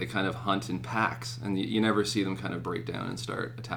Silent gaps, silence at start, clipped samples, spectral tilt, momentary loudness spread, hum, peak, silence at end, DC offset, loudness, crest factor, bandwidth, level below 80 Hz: none; 0 s; under 0.1%; -5 dB/octave; 8 LU; none; -12 dBFS; 0 s; under 0.1%; -31 LUFS; 20 dB; 19 kHz; -58 dBFS